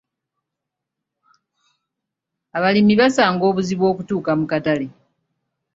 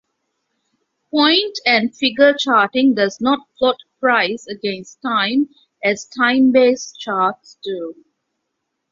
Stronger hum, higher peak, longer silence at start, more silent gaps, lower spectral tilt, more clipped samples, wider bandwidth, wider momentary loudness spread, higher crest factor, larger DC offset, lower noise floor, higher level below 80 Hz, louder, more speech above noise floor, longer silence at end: neither; about the same, 0 dBFS vs 0 dBFS; first, 2.55 s vs 1.15 s; neither; first, -6 dB/octave vs -3.5 dB/octave; neither; about the same, 7.8 kHz vs 7.6 kHz; second, 9 LU vs 13 LU; about the same, 20 dB vs 18 dB; neither; first, -83 dBFS vs -75 dBFS; about the same, -60 dBFS vs -64 dBFS; about the same, -18 LUFS vs -17 LUFS; first, 65 dB vs 58 dB; second, 0.85 s vs 1 s